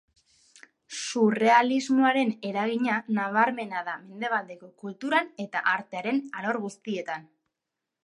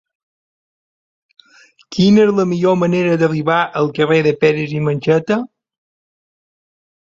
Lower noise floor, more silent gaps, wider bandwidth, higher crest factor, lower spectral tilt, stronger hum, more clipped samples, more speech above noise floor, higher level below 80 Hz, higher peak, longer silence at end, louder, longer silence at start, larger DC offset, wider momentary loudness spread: second, -86 dBFS vs under -90 dBFS; neither; first, 11.5 kHz vs 7.6 kHz; first, 22 dB vs 16 dB; second, -4.5 dB/octave vs -7 dB/octave; neither; neither; second, 60 dB vs over 76 dB; second, -80 dBFS vs -56 dBFS; second, -6 dBFS vs -2 dBFS; second, 0.85 s vs 1.6 s; second, -26 LUFS vs -15 LUFS; second, 0.9 s vs 1.9 s; neither; first, 14 LU vs 7 LU